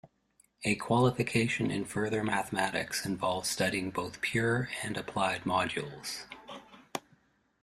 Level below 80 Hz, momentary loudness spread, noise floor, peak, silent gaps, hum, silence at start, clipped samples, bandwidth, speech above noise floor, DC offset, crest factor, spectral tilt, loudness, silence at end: -62 dBFS; 14 LU; -69 dBFS; -12 dBFS; none; none; 0.05 s; under 0.1%; 15.5 kHz; 38 dB; under 0.1%; 22 dB; -4.5 dB/octave; -31 LUFS; 0.65 s